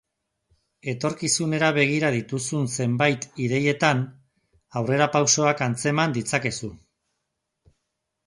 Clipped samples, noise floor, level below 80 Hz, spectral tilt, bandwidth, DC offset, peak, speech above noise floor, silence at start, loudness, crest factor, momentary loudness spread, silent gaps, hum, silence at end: under 0.1%; -80 dBFS; -60 dBFS; -4 dB/octave; 11.5 kHz; under 0.1%; -4 dBFS; 57 dB; 0.85 s; -23 LUFS; 20 dB; 10 LU; none; none; 1.5 s